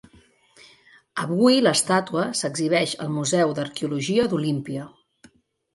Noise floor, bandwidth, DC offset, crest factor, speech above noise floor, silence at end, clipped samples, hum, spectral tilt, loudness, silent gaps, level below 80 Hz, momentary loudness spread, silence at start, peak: -56 dBFS; 11.5 kHz; under 0.1%; 18 dB; 34 dB; 0.85 s; under 0.1%; none; -4.5 dB/octave; -22 LUFS; none; -64 dBFS; 12 LU; 1.15 s; -6 dBFS